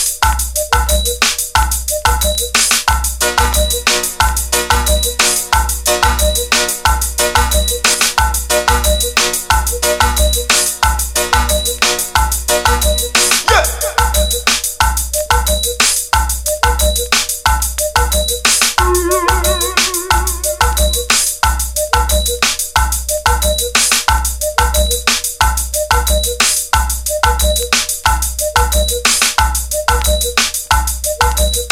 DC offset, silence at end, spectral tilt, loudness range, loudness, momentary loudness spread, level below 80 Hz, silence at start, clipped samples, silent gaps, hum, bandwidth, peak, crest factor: under 0.1%; 0 s; -2 dB/octave; 1 LU; -13 LUFS; 4 LU; -20 dBFS; 0 s; under 0.1%; none; none; 18 kHz; 0 dBFS; 14 dB